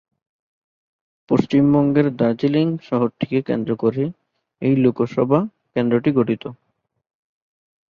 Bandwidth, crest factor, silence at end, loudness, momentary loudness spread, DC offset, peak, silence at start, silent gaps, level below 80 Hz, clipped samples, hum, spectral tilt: 6.8 kHz; 18 dB; 1.35 s; -19 LUFS; 8 LU; under 0.1%; -2 dBFS; 1.3 s; none; -58 dBFS; under 0.1%; none; -9.5 dB/octave